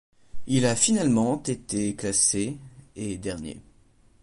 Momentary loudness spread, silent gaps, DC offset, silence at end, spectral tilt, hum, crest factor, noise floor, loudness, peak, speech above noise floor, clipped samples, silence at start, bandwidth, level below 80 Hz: 18 LU; none; under 0.1%; 0.6 s; -4 dB/octave; none; 18 dB; -58 dBFS; -24 LUFS; -8 dBFS; 33 dB; under 0.1%; 0.35 s; 11.5 kHz; -52 dBFS